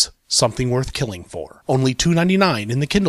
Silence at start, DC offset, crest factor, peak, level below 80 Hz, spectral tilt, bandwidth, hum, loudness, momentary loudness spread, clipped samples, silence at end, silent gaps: 0 s; under 0.1%; 16 dB; -2 dBFS; -40 dBFS; -4.5 dB/octave; 14.5 kHz; none; -19 LUFS; 12 LU; under 0.1%; 0 s; none